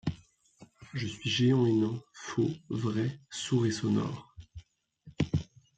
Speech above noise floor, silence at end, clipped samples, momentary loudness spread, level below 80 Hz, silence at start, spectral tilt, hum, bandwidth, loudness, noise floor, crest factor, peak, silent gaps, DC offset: 29 dB; 0.35 s; under 0.1%; 15 LU; -58 dBFS; 0.05 s; -6 dB/octave; none; 9.2 kHz; -31 LUFS; -59 dBFS; 16 dB; -16 dBFS; none; under 0.1%